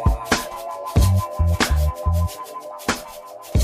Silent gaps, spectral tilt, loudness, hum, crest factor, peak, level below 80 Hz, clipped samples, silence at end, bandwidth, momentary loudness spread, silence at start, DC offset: none; -5 dB/octave; -22 LUFS; none; 16 dB; -6 dBFS; -26 dBFS; under 0.1%; 0 s; 15.5 kHz; 14 LU; 0 s; under 0.1%